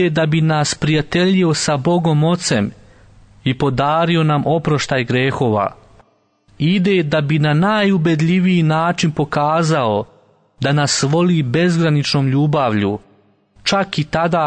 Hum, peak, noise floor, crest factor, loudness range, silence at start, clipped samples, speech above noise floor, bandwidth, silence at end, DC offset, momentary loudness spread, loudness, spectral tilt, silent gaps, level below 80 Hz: none; -4 dBFS; -57 dBFS; 12 dB; 2 LU; 0 s; under 0.1%; 42 dB; 9.6 kHz; 0 s; under 0.1%; 5 LU; -16 LUFS; -5.5 dB/octave; none; -48 dBFS